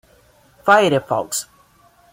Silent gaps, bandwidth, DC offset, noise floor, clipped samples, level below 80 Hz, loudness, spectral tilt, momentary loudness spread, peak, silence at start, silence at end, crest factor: none; 16.5 kHz; under 0.1%; -53 dBFS; under 0.1%; -60 dBFS; -17 LUFS; -3.5 dB/octave; 12 LU; -2 dBFS; 0.65 s; 0.7 s; 18 dB